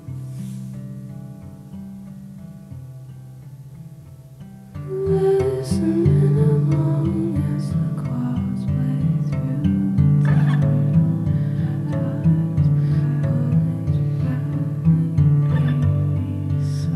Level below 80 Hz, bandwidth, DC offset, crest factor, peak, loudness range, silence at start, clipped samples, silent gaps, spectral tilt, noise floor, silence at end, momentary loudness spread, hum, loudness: -44 dBFS; 11 kHz; under 0.1%; 14 dB; -6 dBFS; 17 LU; 0 s; under 0.1%; none; -9.5 dB/octave; -40 dBFS; 0 s; 21 LU; none; -20 LUFS